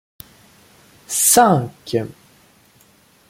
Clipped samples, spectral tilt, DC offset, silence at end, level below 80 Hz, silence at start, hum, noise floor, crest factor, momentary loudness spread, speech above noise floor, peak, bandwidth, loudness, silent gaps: under 0.1%; -3.5 dB/octave; under 0.1%; 1.2 s; -58 dBFS; 1.1 s; none; -53 dBFS; 20 dB; 13 LU; 37 dB; -2 dBFS; 16.5 kHz; -16 LUFS; none